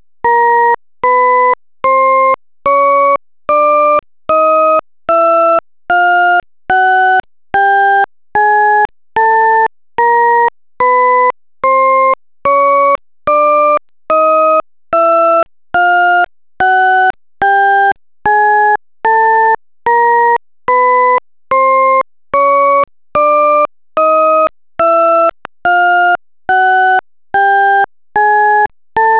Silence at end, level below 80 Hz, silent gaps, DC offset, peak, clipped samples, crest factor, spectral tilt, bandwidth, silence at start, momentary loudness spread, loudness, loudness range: 0 s; -52 dBFS; none; 0.4%; -4 dBFS; under 0.1%; 8 dB; -6.5 dB/octave; 4 kHz; 0.25 s; 6 LU; -11 LUFS; 1 LU